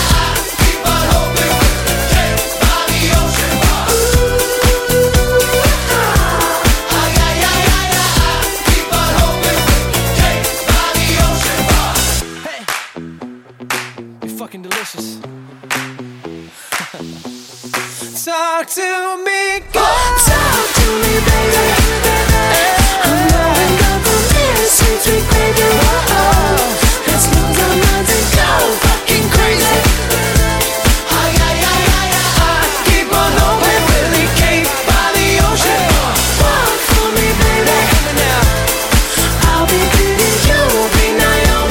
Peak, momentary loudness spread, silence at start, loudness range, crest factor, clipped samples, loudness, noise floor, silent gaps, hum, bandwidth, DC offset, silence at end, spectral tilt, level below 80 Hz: 0 dBFS; 10 LU; 0 s; 10 LU; 12 dB; under 0.1%; -12 LUFS; -32 dBFS; none; none; 17 kHz; under 0.1%; 0 s; -3.5 dB/octave; -18 dBFS